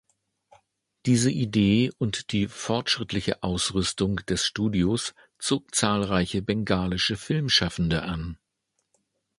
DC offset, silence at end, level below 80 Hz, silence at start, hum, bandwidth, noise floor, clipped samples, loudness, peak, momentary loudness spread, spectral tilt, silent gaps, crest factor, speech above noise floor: under 0.1%; 1.05 s; -46 dBFS; 1.05 s; none; 11.5 kHz; -77 dBFS; under 0.1%; -25 LUFS; -6 dBFS; 7 LU; -4.5 dB/octave; none; 22 dB; 52 dB